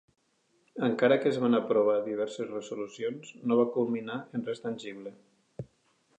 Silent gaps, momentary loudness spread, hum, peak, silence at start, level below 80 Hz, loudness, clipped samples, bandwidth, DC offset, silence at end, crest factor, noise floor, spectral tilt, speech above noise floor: none; 21 LU; none; -10 dBFS; 0.75 s; -76 dBFS; -30 LUFS; under 0.1%; 9 kHz; under 0.1%; 0.55 s; 20 dB; -71 dBFS; -6.5 dB/octave; 42 dB